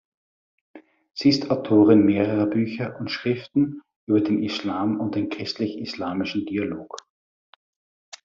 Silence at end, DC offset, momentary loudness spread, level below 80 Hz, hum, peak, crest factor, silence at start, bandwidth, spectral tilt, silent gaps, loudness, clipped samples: 1.25 s; under 0.1%; 13 LU; -64 dBFS; none; -4 dBFS; 20 dB; 0.75 s; 7.4 kHz; -5.5 dB/octave; 3.96-4.07 s; -23 LUFS; under 0.1%